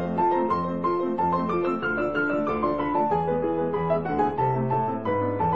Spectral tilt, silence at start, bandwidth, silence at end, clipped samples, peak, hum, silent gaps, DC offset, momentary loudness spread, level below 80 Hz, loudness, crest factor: -9.5 dB/octave; 0 s; 7 kHz; 0 s; under 0.1%; -10 dBFS; none; none; 0.5%; 2 LU; -52 dBFS; -25 LUFS; 14 dB